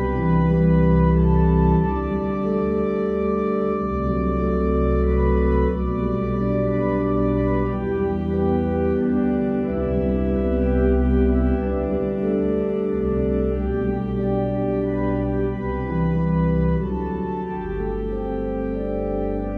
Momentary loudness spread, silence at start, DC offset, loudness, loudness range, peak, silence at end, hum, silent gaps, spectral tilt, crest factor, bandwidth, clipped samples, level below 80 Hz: 8 LU; 0 s; under 0.1%; -22 LUFS; 3 LU; -6 dBFS; 0 s; none; none; -11 dB/octave; 14 dB; 4.2 kHz; under 0.1%; -28 dBFS